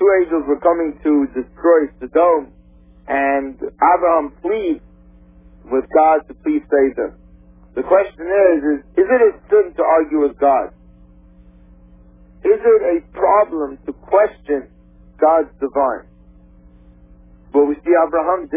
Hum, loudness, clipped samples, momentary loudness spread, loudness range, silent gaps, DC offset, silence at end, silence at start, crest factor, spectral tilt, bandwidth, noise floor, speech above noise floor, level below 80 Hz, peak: none; -16 LUFS; under 0.1%; 10 LU; 4 LU; none; under 0.1%; 0 s; 0 s; 16 dB; -10 dB/octave; 3.6 kHz; -46 dBFS; 30 dB; -46 dBFS; 0 dBFS